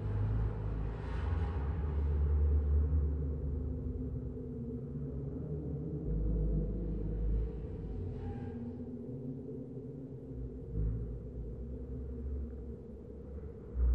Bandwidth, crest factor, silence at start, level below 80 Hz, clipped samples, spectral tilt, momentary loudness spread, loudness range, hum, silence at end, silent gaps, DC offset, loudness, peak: 3.3 kHz; 14 dB; 0 s; -38 dBFS; under 0.1%; -11 dB/octave; 12 LU; 8 LU; none; 0 s; none; under 0.1%; -38 LUFS; -22 dBFS